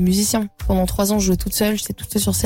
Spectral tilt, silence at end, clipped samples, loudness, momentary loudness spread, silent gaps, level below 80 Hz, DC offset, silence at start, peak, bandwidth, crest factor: -4.5 dB/octave; 0 s; under 0.1%; -19 LUFS; 5 LU; none; -30 dBFS; under 0.1%; 0 s; -8 dBFS; 17 kHz; 12 dB